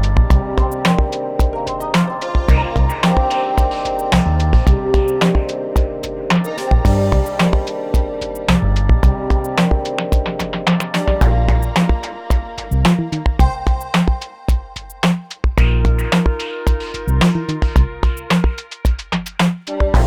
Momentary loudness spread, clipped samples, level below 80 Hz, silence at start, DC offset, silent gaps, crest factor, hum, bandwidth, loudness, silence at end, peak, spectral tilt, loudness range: 6 LU; under 0.1%; -18 dBFS; 0 s; under 0.1%; none; 14 dB; none; 15 kHz; -17 LUFS; 0 s; -2 dBFS; -6.5 dB/octave; 2 LU